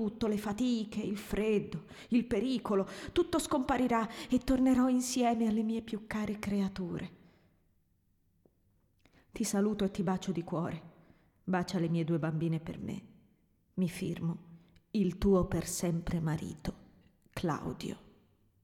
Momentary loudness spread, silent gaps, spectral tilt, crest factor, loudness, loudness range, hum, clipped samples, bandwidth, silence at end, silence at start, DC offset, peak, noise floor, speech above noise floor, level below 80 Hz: 13 LU; none; -6 dB/octave; 18 dB; -33 LUFS; 7 LU; none; under 0.1%; 16.5 kHz; 0.65 s; 0 s; under 0.1%; -16 dBFS; -73 dBFS; 40 dB; -54 dBFS